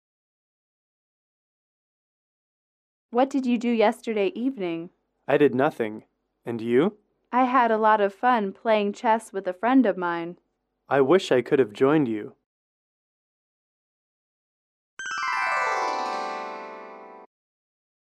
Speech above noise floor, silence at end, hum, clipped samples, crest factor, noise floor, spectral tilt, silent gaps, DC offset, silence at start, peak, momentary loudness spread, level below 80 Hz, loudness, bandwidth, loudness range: 20 dB; 0.75 s; none; under 0.1%; 18 dB; -43 dBFS; -6 dB/octave; 12.46-14.97 s; under 0.1%; 3.1 s; -8 dBFS; 16 LU; -76 dBFS; -24 LUFS; 12 kHz; 8 LU